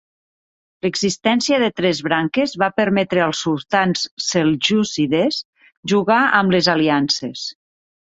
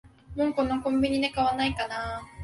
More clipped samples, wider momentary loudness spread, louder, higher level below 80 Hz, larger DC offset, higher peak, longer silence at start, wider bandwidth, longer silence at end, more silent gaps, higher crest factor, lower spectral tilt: neither; about the same, 8 LU vs 8 LU; first, -18 LUFS vs -27 LUFS; second, -58 dBFS vs -48 dBFS; neither; first, -2 dBFS vs -14 dBFS; first, 0.85 s vs 0.05 s; second, 8.2 kHz vs 11.5 kHz; first, 0.55 s vs 0 s; first, 4.11-4.17 s, 5.45-5.53 s, 5.77-5.83 s vs none; about the same, 16 dB vs 14 dB; about the same, -4.5 dB/octave vs -5.5 dB/octave